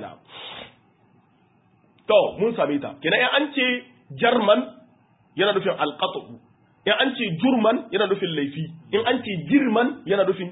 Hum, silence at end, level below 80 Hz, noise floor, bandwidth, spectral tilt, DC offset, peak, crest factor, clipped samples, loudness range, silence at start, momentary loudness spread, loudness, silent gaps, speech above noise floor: none; 0 s; -66 dBFS; -60 dBFS; 4 kHz; -10 dB/octave; under 0.1%; -4 dBFS; 18 dB; under 0.1%; 3 LU; 0 s; 18 LU; -22 LUFS; none; 38 dB